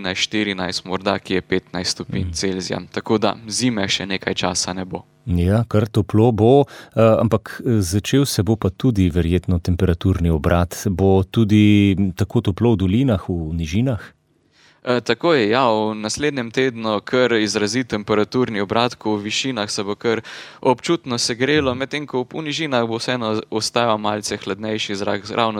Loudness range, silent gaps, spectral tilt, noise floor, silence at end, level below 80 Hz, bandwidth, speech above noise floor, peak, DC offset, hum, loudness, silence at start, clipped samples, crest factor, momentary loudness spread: 4 LU; none; -5.5 dB/octave; -57 dBFS; 0 s; -40 dBFS; 18 kHz; 39 dB; -2 dBFS; under 0.1%; none; -19 LUFS; 0 s; under 0.1%; 18 dB; 8 LU